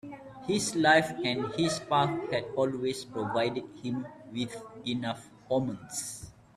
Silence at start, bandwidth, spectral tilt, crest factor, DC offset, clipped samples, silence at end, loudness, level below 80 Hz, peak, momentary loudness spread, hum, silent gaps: 0.05 s; 14.5 kHz; -4 dB/octave; 22 dB; under 0.1%; under 0.1%; 0.25 s; -30 LUFS; -64 dBFS; -10 dBFS; 14 LU; none; none